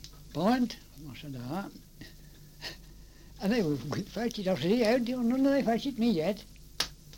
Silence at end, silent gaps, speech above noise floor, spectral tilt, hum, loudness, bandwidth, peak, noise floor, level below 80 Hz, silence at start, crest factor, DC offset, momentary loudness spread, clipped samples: 0 s; none; 22 dB; -5.5 dB/octave; none; -30 LUFS; 17 kHz; -14 dBFS; -51 dBFS; -54 dBFS; 0 s; 18 dB; under 0.1%; 19 LU; under 0.1%